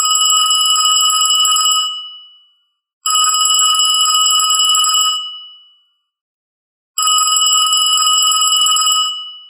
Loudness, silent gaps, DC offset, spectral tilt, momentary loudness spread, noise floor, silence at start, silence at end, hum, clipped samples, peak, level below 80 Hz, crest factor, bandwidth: -10 LUFS; 2.93-3.01 s, 6.21-6.94 s; under 0.1%; 11 dB/octave; 10 LU; -59 dBFS; 0 s; 0.05 s; none; under 0.1%; 0 dBFS; under -90 dBFS; 14 dB; 15.5 kHz